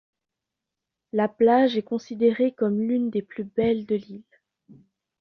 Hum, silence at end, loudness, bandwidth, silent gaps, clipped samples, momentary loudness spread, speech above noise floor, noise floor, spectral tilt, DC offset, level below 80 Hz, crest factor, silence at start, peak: none; 1 s; -24 LUFS; 6.6 kHz; none; under 0.1%; 11 LU; 63 dB; -86 dBFS; -7.5 dB/octave; under 0.1%; -64 dBFS; 16 dB; 1.15 s; -8 dBFS